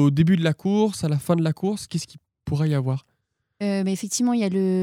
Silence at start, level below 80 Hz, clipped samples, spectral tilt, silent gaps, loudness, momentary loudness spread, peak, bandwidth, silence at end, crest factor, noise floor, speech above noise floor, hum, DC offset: 0 s; -56 dBFS; under 0.1%; -6.5 dB/octave; none; -23 LUFS; 11 LU; -6 dBFS; 15.5 kHz; 0 s; 16 dB; -74 dBFS; 53 dB; none; under 0.1%